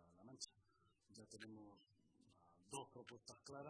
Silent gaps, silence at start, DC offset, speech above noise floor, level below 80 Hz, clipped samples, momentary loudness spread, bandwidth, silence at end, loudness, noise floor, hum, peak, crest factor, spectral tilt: none; 0 s; under 0.1%; 23 dB; -88 dBFS; under 0.1%; 11 LU; 11 kHz; 0 s; -58 LUFS; -81 dBFS; none; -36 dBFS; 24 dB; -3 dB/octave